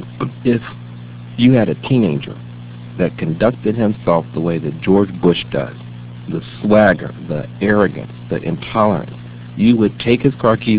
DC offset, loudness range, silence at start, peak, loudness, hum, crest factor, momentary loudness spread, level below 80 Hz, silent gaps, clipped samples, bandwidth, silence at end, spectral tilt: 0.2%; 2 LU; 0 s; 0 dBFS; -16 LUFS; 60 Hz at -30 dBFS; 16 dB; 19 LU; -44 dBFS; none; under 0.1%; 4 kHz; 0 s; -11.5 dB/octave